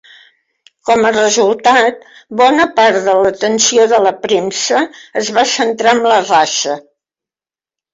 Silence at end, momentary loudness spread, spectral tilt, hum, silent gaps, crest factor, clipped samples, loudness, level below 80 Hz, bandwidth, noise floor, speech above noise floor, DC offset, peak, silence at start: 1.15 s; 7 LU; -2 dB/octave; none; none; 12 dB; under 0.1%; -12 LUFS; -56 dBFS; 8 kHz; under -90 dBFS; over 78 dB; under 0.1%; 0 dBFS; 0.85 s